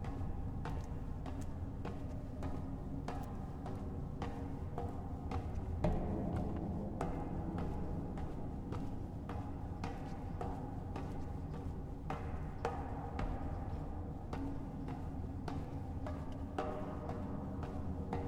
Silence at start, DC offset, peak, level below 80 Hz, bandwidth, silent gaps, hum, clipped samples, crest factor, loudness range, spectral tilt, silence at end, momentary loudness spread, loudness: 0 s; under 0.1%; -22 dBFS; -48 dBFS; 11.5 kHz; none; none; under 0.1%; 20 dB; 4 LU; -8.5 dB/octave; 0 s; 4 LU; -43 LUFS